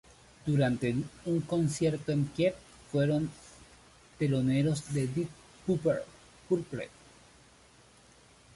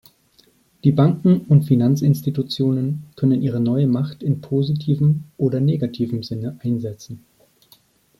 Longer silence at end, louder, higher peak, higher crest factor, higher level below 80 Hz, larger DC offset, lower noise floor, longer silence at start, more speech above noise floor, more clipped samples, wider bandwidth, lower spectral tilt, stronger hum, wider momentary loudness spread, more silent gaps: first, 1.7 s vs 1 s; second, -31 LUFS vs -19 LUFS; second, -16 dBFS vs -2 dBFS; about the same, 16 dB vs 16 dB; about the same, -60 dBFS vs -56 dBFS; neither; about the same, -59 dBFS vs -57 dBFS; second, 0.45 s vs 0.85 s; second, 29 dB vs 39 dB; neither; second, 11.5 kHz vs 13 kHz; second, -7 dB/octave vs -9 dB/octave; neither; about the same, 12 LU vs 10 LU; neither